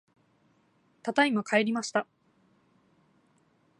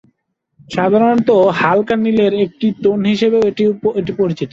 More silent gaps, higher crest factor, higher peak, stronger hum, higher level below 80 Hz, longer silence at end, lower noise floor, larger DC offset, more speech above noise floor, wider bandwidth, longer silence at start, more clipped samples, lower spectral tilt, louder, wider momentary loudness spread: neither; first, 22 dB vs 12 dB; second, -10 dBFS vs -2 dBFS; neither; second, -84 dBFS vs -52 dBFS; first, 1.75 s vs 0.05 s; about the same, -68 dBFS vs -67 dBFS; neither; second, 41 dB vs 53 dB; first, 11.5 kHz vs 7.6 kHz; first, 1.05 s vs 0.7 s; neither; second, -4 dB/octave vs -7 dB/octave; second, -28 LUFS vs -14 LUFS; first, 12 LU vs 6 LU